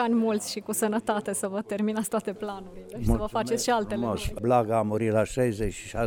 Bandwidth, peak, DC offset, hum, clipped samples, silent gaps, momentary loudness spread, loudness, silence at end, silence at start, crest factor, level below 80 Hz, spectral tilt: 19.5 kHz; -10 dBFS; under 0.1%; none; under 0.1%; none; 8 LU; -27 LUFS; 0 s; 0 s; 18 dB; -42 dBFS; -5 dB/octave